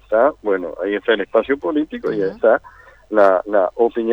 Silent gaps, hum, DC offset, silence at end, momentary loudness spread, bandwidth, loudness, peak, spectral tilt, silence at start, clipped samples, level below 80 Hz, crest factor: none; none; under 0.1%; 0 s; 7 LU; 5.8 kHz; -18 LUFS; -2 dBFS; -7 dB/octave; 0.1 s; under 0.1%; -52 dBFS; 16 dB